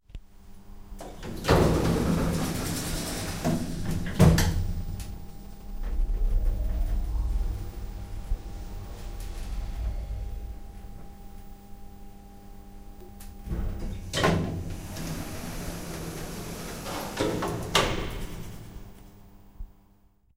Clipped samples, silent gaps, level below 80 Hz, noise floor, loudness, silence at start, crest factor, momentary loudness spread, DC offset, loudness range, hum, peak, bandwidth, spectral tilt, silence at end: under 0.1%; none; -34 dBFS; -61 dBFS; -30 LUFS; 0.1 s; 24 dB; 24 LU; under 0.1%; 13 LU; none; -6 dBFS; 16 kHz; -5.5 dB/octave; 0.7 s